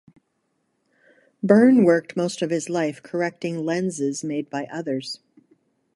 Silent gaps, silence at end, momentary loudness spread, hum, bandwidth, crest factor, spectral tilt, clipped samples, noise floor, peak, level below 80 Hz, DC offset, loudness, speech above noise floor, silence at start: none; 0.8 s; 14 LU; none; 11.5 kHz; 20 dB; -6 dB/octave; under 0.1%; -72 dBFS; -4 dBFS; -70 dBFS; under 0.1%; -22 LUFS; 51 dB; 1.45 s